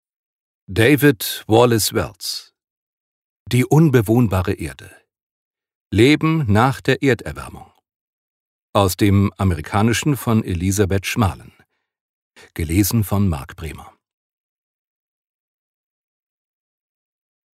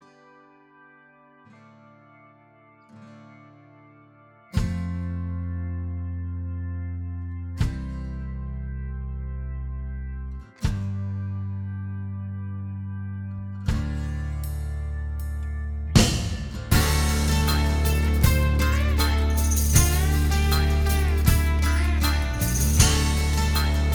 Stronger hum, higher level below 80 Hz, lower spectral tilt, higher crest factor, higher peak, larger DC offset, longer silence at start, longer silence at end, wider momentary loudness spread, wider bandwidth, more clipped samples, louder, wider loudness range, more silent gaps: neither; second, -42 dBFS vs -26 dBFS; about the same, -5.5 dB/octave vs -4.5 dB/octave; about the same, 18 dB vs 22 dB; about the same, 0 dBFS vs -2 dBFS; neither; second, 0.7 s vs 2.95 s; first, 3.7 s vs 0 s; about the same, 15 LU vs 14 LU; second, 16 kHz vs over 20 kHz; neither; first, -18 LUFS vs -25 LUFS; second, 6 LU vs 11 LU; first, 2.70-3.46 s, 5.22-5.54 s, 5.75-5.90 s, 7.96-8.73 s, 12.01-12.31 s vs none